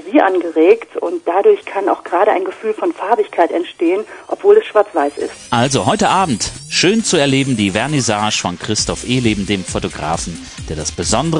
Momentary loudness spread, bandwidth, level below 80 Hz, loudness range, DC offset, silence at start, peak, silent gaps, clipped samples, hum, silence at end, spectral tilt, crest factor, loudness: 9 LU; 10.5 kHz; -40 dBFS; 3 LU; under 0.1%; 0.05 s; 0 dBFS; none; under 0.1%; none; 0 s; -4 dB/octave; 16 dB; -15 LUFS